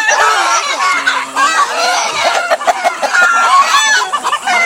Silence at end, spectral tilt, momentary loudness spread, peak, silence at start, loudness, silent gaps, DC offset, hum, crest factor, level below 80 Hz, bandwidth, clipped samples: 0 s; 1.5 dB/octave; 6 LU; 0 dBFS; 0 s; -11 LUFS; none; under 0.1%; none; 12 dB; -60 dBFS; 17 kHz; under 0.1%